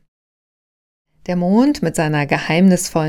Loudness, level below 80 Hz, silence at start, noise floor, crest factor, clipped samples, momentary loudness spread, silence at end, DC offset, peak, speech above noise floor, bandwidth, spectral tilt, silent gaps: -16 LUFS; -48 dBFS; 1.3 s; under -90 dBFS; 18 dB; under 0.1%; 8 LU; 0 s; under 0.1%; 0 dBFS; over 75 dB; 16 kHz; -6 dB/octave; none